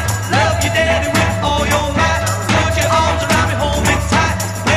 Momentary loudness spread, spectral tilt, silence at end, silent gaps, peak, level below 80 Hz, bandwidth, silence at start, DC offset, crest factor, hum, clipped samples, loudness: 2 LU; -4 dB/octave; 0 s; none; 0 dBFS; -26 dBFS; 15.5 kHz; 0 s; 0.6%; 14 dB; none; under 0.1%; -15 LUFS